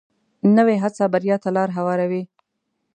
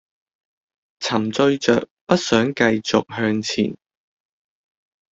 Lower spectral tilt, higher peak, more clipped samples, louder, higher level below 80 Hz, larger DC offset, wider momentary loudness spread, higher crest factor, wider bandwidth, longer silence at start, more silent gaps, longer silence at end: first, -8 dB/octave vs -4.5 dB/octave; about the same, -4 dBFS vs -2 dBFS; neither; about the same, -20 LUFS vs -20 LUFS; second, -74 dBFS vs -58 dBFS; neither; first, 9 LU vs 6 LU; about the same, 16 dB vs 20 dB; first, 9.2 kHz vs 8 kHz; second, 0.45 s vs 1 s; second, none vs 1.91-2.07 s; second, 0.7 s vs 1.35 s